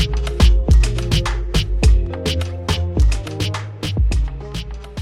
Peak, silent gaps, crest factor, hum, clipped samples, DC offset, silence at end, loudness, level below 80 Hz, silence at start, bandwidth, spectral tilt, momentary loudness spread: -2 dBFS; none; 14 dB; none; under 0.1%; under 0.1%; 0 s; -19 LUFS; -18 dBFS; 0 s; 12.5 kHz; -5.5 dB/octave; 10 LU